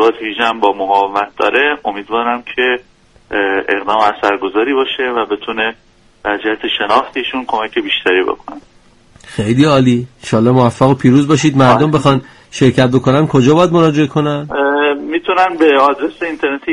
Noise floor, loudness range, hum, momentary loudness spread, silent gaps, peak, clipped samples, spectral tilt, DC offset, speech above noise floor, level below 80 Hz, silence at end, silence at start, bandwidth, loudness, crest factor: -45 dBFS; 5 LU; none; 9 LU; none; 0 dBFS; under 0.1%; -6 dB/octave; under 0.1%; 32 dB; -46 dBFS; 0 s; 0 s; 11 kHz; -13 LUFS; 14 dB